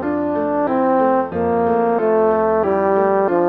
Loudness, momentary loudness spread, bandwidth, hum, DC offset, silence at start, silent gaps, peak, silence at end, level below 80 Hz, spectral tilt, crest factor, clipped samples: -17 LUFS; 4 LU; 4.5 kHz; none; under 0.1%; 0 s; none; -4 dBFS; 0 s; -52 dBFS; -10 dB/octave; 12 dB; under 0.1%